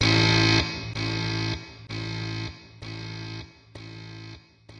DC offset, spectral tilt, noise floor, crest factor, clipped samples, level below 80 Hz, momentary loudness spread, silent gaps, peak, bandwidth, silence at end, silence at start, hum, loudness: under 0.1%; -4.5 dB/octave; -47 dBFS; 20 dB; under 0.1%; -46 dBFS; 24 LU; none; -8 dBFS; 9.8 kHz; 0 s; 0 s; none; -25 LUFS